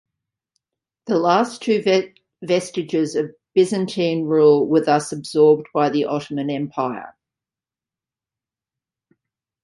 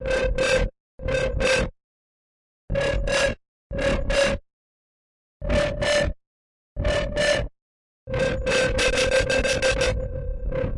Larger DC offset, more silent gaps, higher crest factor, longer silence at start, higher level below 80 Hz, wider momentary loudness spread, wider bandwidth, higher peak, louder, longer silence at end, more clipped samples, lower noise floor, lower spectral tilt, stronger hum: neither; second, none vs 0.80-0.98 s, 1.84-2.68 s, 3.48-3.70 s, 4.53-5.40 s, 6.27-6.76 s, 7.62-8.07 s; about the same, 18 dB vs 14 dB; first, 1.05 s vs 0 s; second, -68 dBFS vs -32 dBFS; about the same, 10 LU vs 11 LU; about the same, 11.5 kHz vs 11.5 kHz; first, -2 dBFS vs -10 dBFS; first, -19 LUFS vs -23 LUFS; first, 2.55 s vs 0 s; neither; about the same, under -90 dBFS vs under -90 dBFS; first, -5.5 dB/octave vs -4 dB/octave; neither